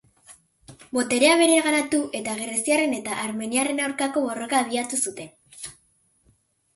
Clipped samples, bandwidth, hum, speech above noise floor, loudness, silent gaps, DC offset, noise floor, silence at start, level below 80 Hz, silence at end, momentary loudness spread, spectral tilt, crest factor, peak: under 0.1%; 12 kHz; none; 42 dB; -22 LUFS; none; under 0.1%; -64 dBFS; 0.3 s; -68 dBFS; 1.05 s; 21 LU; -2 dB/octave; 20 dB; -6 dBFS